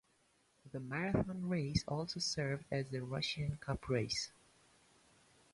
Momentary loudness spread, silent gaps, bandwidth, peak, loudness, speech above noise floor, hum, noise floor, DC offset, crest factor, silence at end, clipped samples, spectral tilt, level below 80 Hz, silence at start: 6 LU; none; 11.5 kHz; -20 dBFS; -39 LUFS; 36 dB; none; -74 dBFS; under 0.1%; 22 dB; 1.25 s; under 0.1%; -5 dB/octave; -58 dBFS; 0.65 s